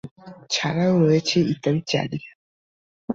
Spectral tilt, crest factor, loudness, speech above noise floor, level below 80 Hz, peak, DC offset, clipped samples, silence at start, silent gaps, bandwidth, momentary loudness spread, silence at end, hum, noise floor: -5.5 dB/octave; 16 dB; -21 LUFS; over 69 dB; -58 dBFS; -8 dBFS; under 0.1%; under 0.1%; 0.05 s; 0.11-0.16 s, 2.35-3.08 s; 7.8 kHz; 16 LU; 0 s; none; under -90 dBFS